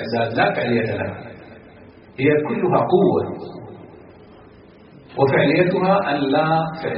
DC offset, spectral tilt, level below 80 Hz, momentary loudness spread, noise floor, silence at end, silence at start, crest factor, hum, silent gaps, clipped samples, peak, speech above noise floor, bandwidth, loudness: under 0.1%; -5 dB/octave; -56 dBFS; 19 LU; -45 dBFS; 0 s; 0 s; 16 dB; none; none; under 0.1%; -4 dBFS; 27 dB; 5.6 kHz; -19 LUFS